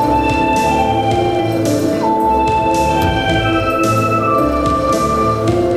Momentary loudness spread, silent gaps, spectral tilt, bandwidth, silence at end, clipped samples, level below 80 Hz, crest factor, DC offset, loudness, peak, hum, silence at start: 2 LU; none; -6 dB/octave; 15.5 kHz; 0 s; under 0.1%; -30 dBFS; 12 dB; under 0.1%; -14 LUFS; -2 dBFS; none; 0 s